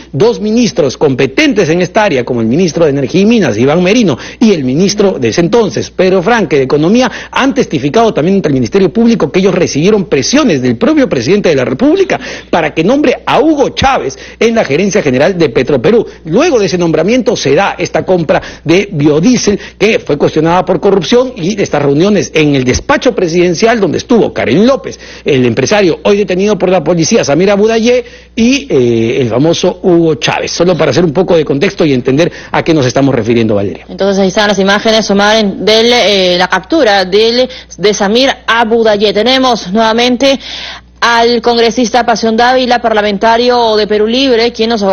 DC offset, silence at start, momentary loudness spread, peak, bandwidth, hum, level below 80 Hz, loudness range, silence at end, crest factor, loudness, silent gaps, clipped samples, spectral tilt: under 0.1%; 0 s; 4 LU; 0 dBFS; 8.2 kHz; none; -36 dBFS; 1 LU; 0 s; 8 dB; -9 LUFS; none; 0.3%; -5 dB/octave